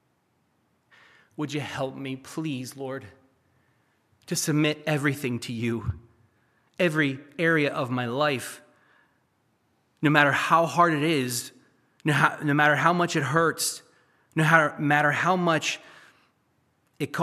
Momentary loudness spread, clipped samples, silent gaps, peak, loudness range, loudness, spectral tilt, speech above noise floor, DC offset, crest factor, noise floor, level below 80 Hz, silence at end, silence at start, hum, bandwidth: 15 LU; under 0.1%; none; -2 dBFS; 11 LU; -25 LUFS; -4.5 dB/octave; 46 dB; under 0.1%; 24 dB; -70 dBFS; -60 dBFS; 0 s; 1.4 s; none; 15 kHz